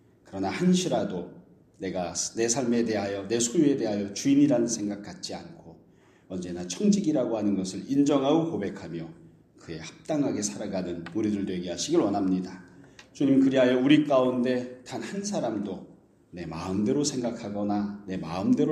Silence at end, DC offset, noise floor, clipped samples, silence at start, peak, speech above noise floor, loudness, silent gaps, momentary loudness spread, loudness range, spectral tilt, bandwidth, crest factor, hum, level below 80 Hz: 0 s; under 0.1%; -58 dBFS; under 0.1%; 0.3 s; -6 dBFS; 32 dB; -27 LUFS; none; 16 LU; 6 LU; -5 dB/octave; 12.5 kHz; 20 dB; none; -64 dBFS